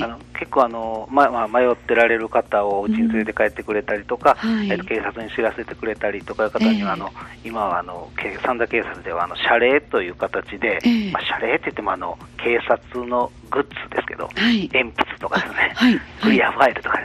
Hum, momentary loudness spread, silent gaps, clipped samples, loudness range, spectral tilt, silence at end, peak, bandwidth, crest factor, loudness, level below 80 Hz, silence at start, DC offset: none; 9 LU; none; under 0.1%; 4 LU; -6 dB/octave; 0 s; -2 dBFS; 12 kHz; 18 dB; -20 LUFS; -48 dBFS; 0 s; under 0.1%